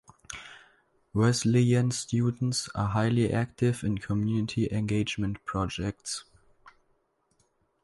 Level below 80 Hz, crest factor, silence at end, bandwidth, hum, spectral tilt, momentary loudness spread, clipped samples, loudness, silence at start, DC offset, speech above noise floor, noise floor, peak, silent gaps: -52 dBFS; 16 dB; 1.15 s; 11.5 kHz; none; -6 dB/octave; 12 LU; under 0.1%; -28 LUFS; 0.3 s; under 0.1%; 44 dB; -71 dBFS; -12 dBFS; none